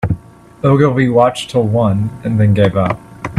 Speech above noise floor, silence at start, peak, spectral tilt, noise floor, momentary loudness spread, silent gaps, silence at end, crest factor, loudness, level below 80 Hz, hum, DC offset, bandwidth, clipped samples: 23 dB; 0 s; 0 dBFS; -7.5 dB/octave; -35 dBFS; 8 LU; none; 0 s; 14 dB; -14 LUFS; -40 dBFS; none; under 0.1%; 11.5 kHz; under 0.1%